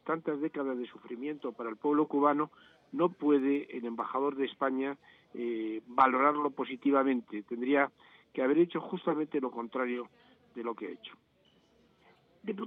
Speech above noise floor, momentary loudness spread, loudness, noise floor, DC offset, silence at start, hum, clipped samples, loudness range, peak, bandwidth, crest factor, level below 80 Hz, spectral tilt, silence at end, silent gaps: 36 dB; 14 LU; -32 LUFS; -68 dBFS; under 0.1%; 0.05 s; none; under 0.1%; 6 LU; -10 dBFS; 4 kHz; 24 dB; -84 dBFS; -8.5 dB/octave; 0 s; none